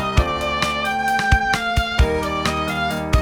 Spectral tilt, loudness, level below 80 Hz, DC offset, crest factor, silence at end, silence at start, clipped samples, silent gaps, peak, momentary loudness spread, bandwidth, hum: -4.5 dB/octave; -20 LUFS; -26 dBFS; 0.1%; 18 dB; 0 s; 0 s; under 0.1%; none; -2 dBFS; 4 LU; 19.5 kHz; none